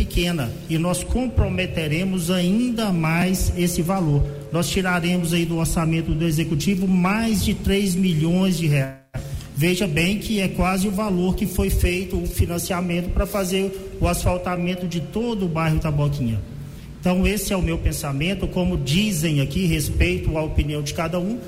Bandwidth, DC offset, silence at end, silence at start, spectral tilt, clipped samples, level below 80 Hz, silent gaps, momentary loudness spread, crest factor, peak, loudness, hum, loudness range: 16 kHz; under 0.1%; 0 s; 0 s; -5.5 dB/octave; under 0.1%; -30 dBFS; none; 5 LU; 12 dB; -8 dBFS; -22 LUFS; none; 3 LU